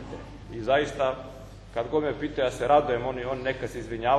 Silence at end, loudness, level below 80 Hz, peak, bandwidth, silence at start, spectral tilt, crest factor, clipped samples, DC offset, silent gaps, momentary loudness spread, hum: 0 s; -27 LUFS; -48 dBFS; -8 dBFS; 13 kHz; 0 s; -5.5 dB/octave; 20 dB; under 0.1%; under 0.1%; none; 18 LU; none